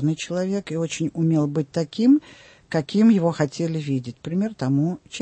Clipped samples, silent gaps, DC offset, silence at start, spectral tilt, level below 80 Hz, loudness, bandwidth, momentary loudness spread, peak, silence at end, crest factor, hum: under 0.1%; none; under 0.1%; 0 s; -7 dB/octave; -62 dBFS; -22 LUFS; 8.8 kHz; 9 LU; -8 dBFS; 0 s; 14 dB; none